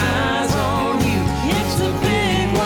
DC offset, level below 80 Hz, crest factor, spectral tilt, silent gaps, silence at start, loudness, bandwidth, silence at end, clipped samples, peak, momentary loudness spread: under 0.1%; -32 dBFS; 10 dB; -5 dB/octave; none; 0 s; -19 LUFS; 20 kHz; 0 s; under 0.1%; -8 dBFS; 2 LU